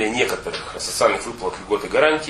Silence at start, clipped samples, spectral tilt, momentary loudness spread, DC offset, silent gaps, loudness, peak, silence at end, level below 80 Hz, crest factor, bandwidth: 0 s; under 0.1%; -2.5 dB/octave; 10 LU; under 0.1%; none; -21 LUFS; 0 dBFS; 0 s; -48 dBFS; 20 dB; 13.5 kHz